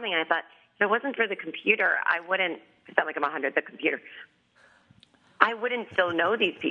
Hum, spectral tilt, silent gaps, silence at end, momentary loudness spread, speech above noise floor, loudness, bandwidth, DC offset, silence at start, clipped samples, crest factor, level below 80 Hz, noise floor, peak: none; -5.5 dB/octave; none; 0 s; 6 LU; 34 dB; -26 LUFS; 7.2 kHz; under 0.1%; 0 s; under 0.1%; 28 dB; -82 dBFS; -61 dBFS; 0 dBFS